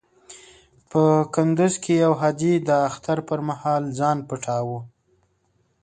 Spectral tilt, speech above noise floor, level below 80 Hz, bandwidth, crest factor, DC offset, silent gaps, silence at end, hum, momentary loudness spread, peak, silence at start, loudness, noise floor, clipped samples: -6.5 dB/octave; 46 dB; -62 dBFS; 9.4 kHz; 18 dB; under 0.1%; none; 0.95 s; none; 8 LU; -4 dBFS; 0.3 s; -22 LUFS; -66 dBFS; under 0.1%